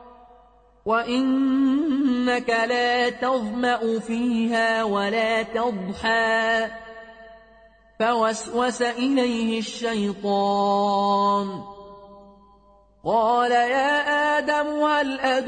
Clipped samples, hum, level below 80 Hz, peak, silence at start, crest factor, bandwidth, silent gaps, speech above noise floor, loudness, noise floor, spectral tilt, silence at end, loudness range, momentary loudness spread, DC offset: under 0.1%; none; -58 dBFS; -10 dBFS; 0 s; 14 dB; 9.4 kHz; none; 33 dB; -22 LUFS; -55 dBFS; -4.5 dB/octave; 0 s; 3 LU; 6 LU; under 0.1%